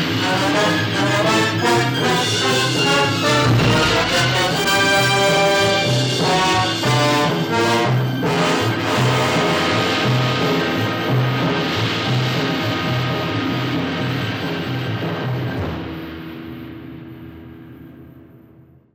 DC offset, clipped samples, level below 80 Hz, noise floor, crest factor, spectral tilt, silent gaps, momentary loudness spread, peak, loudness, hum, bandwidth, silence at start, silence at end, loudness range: under 0.1%; under 0.1%; -46 dBFS; -48 dBFS; 14 dB; -4.5 dB/octave; none; 10 LU; -6 dBFS; -17 LUFS; none; over 20 kHz; 0 s; 0.75 s; 11 LU